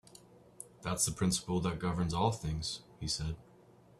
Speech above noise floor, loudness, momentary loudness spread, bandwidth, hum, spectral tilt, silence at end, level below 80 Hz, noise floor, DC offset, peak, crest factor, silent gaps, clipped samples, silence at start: 26 dB; -35 LUFS; 12 LU; 13.5 kHz; none; -4.5 dB/octave; 0.55 s; -52 dBFS; -61 dBFS; under 0.1%; -16 dBFS; 20 dB; none; under 0.1%; 0.3 s